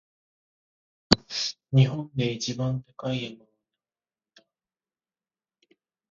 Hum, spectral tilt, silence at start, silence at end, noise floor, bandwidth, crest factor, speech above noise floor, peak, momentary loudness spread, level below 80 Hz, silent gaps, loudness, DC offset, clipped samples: none; -5.5 dB/octave; 1.1 s; 2.75 s; under -90 dBFS; 7.8 kHz; 30 dB; over 64 dB; 0 dBFS; 10 LU; -54 dBFS; none; -26 LUFS; under 0.1%; under 0.1%